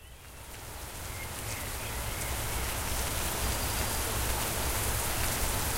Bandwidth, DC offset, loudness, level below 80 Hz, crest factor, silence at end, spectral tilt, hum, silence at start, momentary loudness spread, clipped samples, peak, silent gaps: 16 kHz; under 0.1%; -32 LUFS; -38 dBFS; 18 dB; 0 s; -2.5 dB/octave; none; 0 s; 12 LU; under 0.1%; -16 dBFS; none